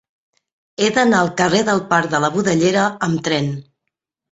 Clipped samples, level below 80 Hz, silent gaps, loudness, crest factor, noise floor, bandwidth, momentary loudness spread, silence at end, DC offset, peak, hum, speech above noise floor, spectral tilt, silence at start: under 0.1%; -56 dBFS; none; -17 LUFS; 18 dB; -79 dBFS; 8.2 kHz; 6 LU; 0.7 s; under 0.1%; 0 dBFS; none; 62 dB; -4.5 dB/octave; 0.8 s